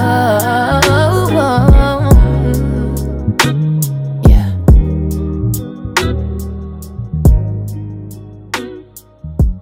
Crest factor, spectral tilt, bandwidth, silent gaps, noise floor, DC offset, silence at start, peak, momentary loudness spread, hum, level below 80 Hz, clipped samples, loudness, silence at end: 12 dB; -6 dB/octave; 16.5 kHz; none; -36 dBFS; under 0.1%; 0 s; 0 dBFS; 17 LU; none; -16 dBFS; 0.2%; -13 LUFS; 0 s